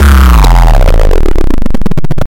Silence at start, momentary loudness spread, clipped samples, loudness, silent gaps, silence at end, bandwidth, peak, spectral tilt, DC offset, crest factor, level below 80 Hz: 0 s; 10 LU; 0.2%; -9 LUFS; none; 0.05 s; 16.5 kHz; 0 dBFS; -6 dB/octave; under 0.1%; 2 dB; -4 dBFS